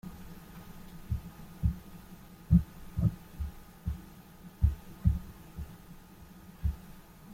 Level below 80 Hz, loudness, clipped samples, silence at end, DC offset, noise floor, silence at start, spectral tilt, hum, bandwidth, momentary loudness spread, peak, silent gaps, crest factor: -40 dBFS; -34 LUFS; under 0.1%; 0 s; under 0.1%; -52 dBFS; 0.05 s; -8.5 dB/octave; none; 16.5 kHz; 23 LU; -12 dBFS; none; 22 dB